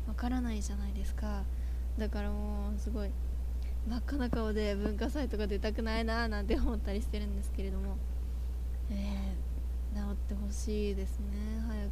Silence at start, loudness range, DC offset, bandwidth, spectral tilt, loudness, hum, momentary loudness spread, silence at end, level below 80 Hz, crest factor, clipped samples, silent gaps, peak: 0 s; 3 LU; under 0.1%; 14.5 kHz; -6.5 dB/octave; -36 LUFS; none; 5 LU; 0 s; -34 dBFS; 16 dB; under 0.1%; none; -18 dBFS